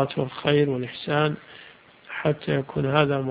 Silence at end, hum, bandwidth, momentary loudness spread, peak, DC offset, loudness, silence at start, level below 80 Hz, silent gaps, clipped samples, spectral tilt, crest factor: 0 s; none; 5 kHz; 15 LU; -2 dBFS; under 0.1%; -24 LUFS; 0 s; -56 dBFS; none; under 0.1%; -11 dB/octave; 22 dB